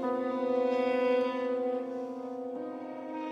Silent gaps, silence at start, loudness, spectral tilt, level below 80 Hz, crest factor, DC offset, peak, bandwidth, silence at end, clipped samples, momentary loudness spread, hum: none; 0 s; -32 LUFS; -5.5 dB/octave; under -90 dBFS; 14 dB; under 0.1%; -18 dBFS; 7.2 kHz; 0 s; under 0.1%; 11 LU; none